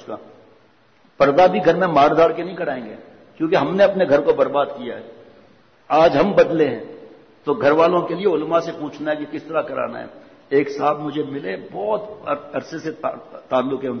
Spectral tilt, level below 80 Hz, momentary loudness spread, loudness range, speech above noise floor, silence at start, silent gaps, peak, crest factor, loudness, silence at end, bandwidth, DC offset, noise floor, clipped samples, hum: -7 dB/octave; -56 dBFS; 15 LU; 6 LU; 37 dB; 0 s; none; -4 dBFS; 16 dB; -19 LUFS; 0 s; 6.6 kHz; under 0.1%; -55 dBFS; under 0.1%; none